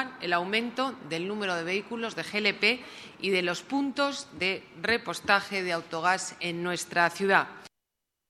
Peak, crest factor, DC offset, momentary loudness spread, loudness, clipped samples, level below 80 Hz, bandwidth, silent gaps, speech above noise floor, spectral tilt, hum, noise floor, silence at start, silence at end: -6 dBFS; 22 dB; under 0.1%; 8 LU; -28 LUFS; under 0.1%; -70 dBFS; 14 kHz; none; 55 dB; -3.5 dB/octave; none; -84 dBFS; 0 s; 0.6 s